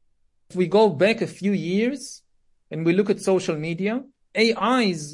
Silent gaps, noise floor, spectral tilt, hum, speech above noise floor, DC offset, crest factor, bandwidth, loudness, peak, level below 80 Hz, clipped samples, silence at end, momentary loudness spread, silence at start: none; -63 dBFS; -5.5 dB/octave; none; 42 dB; under 0.1%; 16 dB; 11.5 kHz; -22 LUFS; -6 dBFS; -66 dBFS; under 0.1%; 0 s; 13 LU; 0.5 s